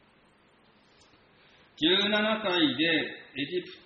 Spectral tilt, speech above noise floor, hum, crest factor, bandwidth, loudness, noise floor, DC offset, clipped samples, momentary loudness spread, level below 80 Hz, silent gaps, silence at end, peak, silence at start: -5 dB/octave; 35 dB; none; 18 dB; 7.4 kHz; -26 LUFS; -62 dBFS; under 0.1%; under 0.1%; 10 LU; -70 dBFS; none; 0.1 s; -12 dBFS; 1.8 s